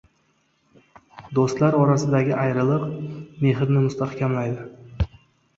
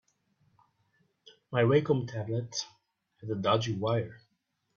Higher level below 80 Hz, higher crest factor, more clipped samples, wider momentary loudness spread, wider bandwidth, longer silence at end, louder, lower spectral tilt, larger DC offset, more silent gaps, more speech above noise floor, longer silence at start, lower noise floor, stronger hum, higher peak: first, -42 dBFS vs -68 dBFS; about the same, 18 dB vs 22 dB; neither; second, 11 LU vs 15 LU; about the same, 7.8 kHz vs 7.2 kHz; about the same, 0.5 s vs 0.6 s; first, -22 LUFS vs -30 LUFS; first, -8 dB/octave vs -6 dB/octave; neither; neither; second, 45 dB vs 50 dB; second, 1.15 s vs 1.5 s; second, -66 dBFS vs -78 dBFS; neither; first, -4 dBFS vs -10 dBFS